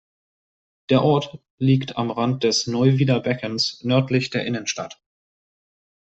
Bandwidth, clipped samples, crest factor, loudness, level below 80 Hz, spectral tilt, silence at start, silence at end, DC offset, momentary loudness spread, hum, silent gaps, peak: 8.2 kHz; under 0.1%; 18 dB; -21 LUFS; -60 dBFS; -5.5 dB/octave; 0.9 s; 1.1 s; under 0.1%; 8 LU; none; 1.50-1.58 s; -4 dBFS